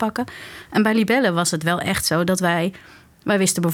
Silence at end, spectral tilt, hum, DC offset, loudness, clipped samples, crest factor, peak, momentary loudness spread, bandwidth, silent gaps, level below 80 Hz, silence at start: 0 s; -4 dB/octave; none; under 0.1%; -20 LUFS; under 0.1%; 16 dB; -6 dBFS; 11 LU; 18 kHz; none; -54 dBFS; 0 s